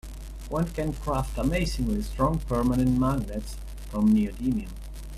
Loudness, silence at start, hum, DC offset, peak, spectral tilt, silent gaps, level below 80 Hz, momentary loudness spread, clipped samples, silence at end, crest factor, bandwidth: -27 LUFS; 0.05 s; none; under 0.1%; -10 dBFS; -7 dB/octave; none; -34 dBFS; 17 LU; under 0.1%; 0 s; 16 dB; 14.5 kHz